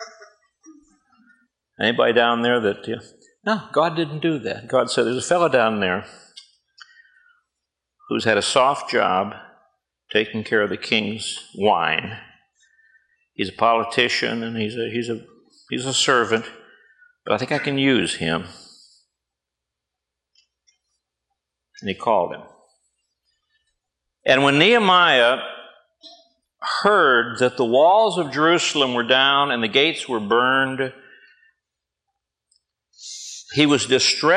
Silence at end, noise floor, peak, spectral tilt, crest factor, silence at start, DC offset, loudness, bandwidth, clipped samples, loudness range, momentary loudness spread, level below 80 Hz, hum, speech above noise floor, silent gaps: 0 s; -84 dBFS; 0 dBFS; -3.5 dB/octave; 22 dB; 0 s; under 0.1%; -19 LUFS; 11 kHz; under 0.1%; 11 LU; 15 LU; -68 dBFS; none; 65 dB; none